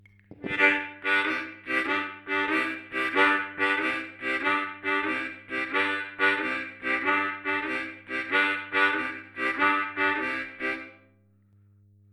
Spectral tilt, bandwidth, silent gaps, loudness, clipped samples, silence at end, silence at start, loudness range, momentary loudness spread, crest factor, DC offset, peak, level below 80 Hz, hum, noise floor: -4 dB/octave; 12.5 kHz; none; -26 LUFS; under 0.1%; 1.2 s; 0.3 s; 2 LU; 9 LU; 20 dB; under 0.1%; -8 dBFS; -68 dBFS; none; -61 dBFS